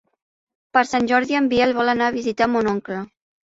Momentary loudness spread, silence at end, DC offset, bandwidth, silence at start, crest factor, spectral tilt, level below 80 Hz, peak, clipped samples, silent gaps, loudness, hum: 10 LU; 0.4 s; under 0.1%; 8 kHz; 0.75 s; 18 dB; -5 dB/octave; -54 dBFS; -2 dBFS; under 0.1%; none; -19 LUFS; none